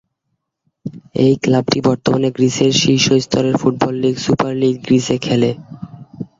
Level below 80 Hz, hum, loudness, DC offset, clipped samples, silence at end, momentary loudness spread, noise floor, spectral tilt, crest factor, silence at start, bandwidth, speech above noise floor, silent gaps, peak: -50 dBFS; none; -15 LUFS; under 0.1%; under 0.1%; 0.15 s; 19 LU; -73 dBFS; -5 dB/octave; 16 dB; 0.85 s; 7.8 kHz; 58 dB; none; 0 dBFS